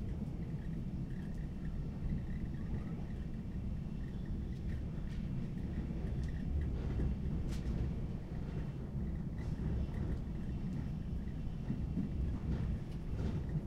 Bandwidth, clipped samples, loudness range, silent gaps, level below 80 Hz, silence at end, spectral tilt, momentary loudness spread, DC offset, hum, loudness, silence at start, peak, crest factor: 8.8 kHz; under 0.1%; 2 LU; none; -42 dBFS; 0 s; -9 dB/octave; 4 LU; under 0.1%; none; -41 LUFS; 0 s; -24 dBFS; 14 dB